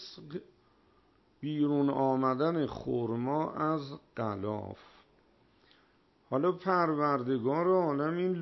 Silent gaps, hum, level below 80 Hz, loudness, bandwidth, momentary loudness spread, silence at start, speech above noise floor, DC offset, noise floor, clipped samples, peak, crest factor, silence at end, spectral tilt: none; none; -68 dBFS; -31 LUFS; 6 kHz; 15 LU; 0 s; 36 dB; under 0.1%; -67 dBFS; under 0.1%; -16 dBFS; 16 dB; 0 s; -9 dB/octave